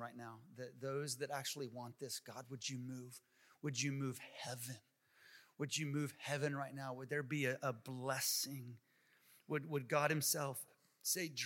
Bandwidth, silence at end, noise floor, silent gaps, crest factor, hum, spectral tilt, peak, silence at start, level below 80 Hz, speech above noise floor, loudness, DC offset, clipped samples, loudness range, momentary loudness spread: 16.5 kHz; 0 s; -71 dBFS; none; 22 dB; none; -3.5 dB/octave; -20 dBFS; 0 s; under -90 dBFS; 28 dB; -42 LUFS; under 0.1%; under 0.1%; 6 LU; 17 LU